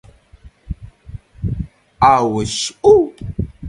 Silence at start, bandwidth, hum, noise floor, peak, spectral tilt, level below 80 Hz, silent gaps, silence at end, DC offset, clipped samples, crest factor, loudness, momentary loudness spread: 0.45 s; 11.5 kHz; none; -45 dBFS; 0 dBFS; -5 dB/octave; -34 dBFS; none; 0 s; under 0.1%; under 0.1%; 18 dB; -16 LUFS; 22 LU